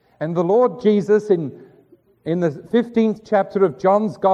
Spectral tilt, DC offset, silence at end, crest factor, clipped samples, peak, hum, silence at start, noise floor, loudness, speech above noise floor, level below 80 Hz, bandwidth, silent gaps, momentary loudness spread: -8 dB/octave; under 0.1%; 0 s; 14 dB; under 0.1%; -4 dBFS; none; 0.2 s; -53 dBFS; -19 LUFS; 36 dB; -64 dBFS; 8 kHz; none; 7 LU